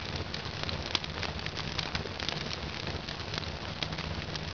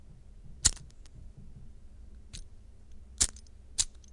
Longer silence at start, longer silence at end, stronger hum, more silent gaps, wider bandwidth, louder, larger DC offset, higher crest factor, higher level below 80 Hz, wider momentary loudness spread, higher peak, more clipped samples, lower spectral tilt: about the same, 0 s vs 0 s; about the same, 0 s vs 0 s; neither; neither; second, 5.4 kHz vs 11.5 kHz; second, -34 LUFS vs -30 LUFS; first, 0.2% vs under 0.1%; second, 26 dB vs 32 dB; about the same, -48 dBFS vs -46 dBFS; second, 4 LU vs 26 LU; second, -10 dBFS vs -6 dBFS; neither; first, -4 dB/octave vs -0.5 dB/octave